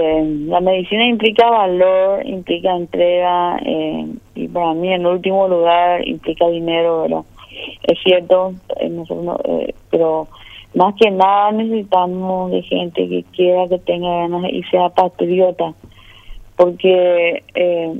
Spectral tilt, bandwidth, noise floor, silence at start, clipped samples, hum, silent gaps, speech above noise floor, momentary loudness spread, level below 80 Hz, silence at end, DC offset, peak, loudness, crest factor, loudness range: -7.5 dB/octave; 5.6 kHz; -35 dBFS; 0 s; under 0.1%; none; none; 20 dB; 10 LU; -48 dBFS; 0 s; under 0.1%; 0 dBFS; -16 LUFS; 16 dB; 3 LU